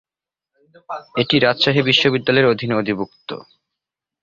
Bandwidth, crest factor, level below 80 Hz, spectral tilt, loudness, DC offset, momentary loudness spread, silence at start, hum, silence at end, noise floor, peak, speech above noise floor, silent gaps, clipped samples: 7.4 kHz; 18 dB; -56 dBFS; -5.5 dB/octave; -16 LUFS; under 0.1%; 18 LU; 0.9 s; none; 0.8 s; -86 dBFS; 0 dBFS; 68 dB; none; under 0.1%